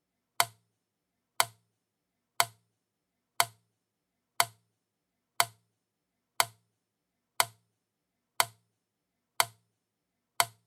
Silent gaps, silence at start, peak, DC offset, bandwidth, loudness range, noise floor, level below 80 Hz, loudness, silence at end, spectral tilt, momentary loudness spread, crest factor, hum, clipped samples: none; 0.4 s; -4 dBFS; under 0.1%; over 20 kHz; 0 LU; -84 dBFS; -86 dBFS; -31 LUFS; 0.2 s; 0.5 dB/octave; 0 LU; 32 dB; none; under 0.1%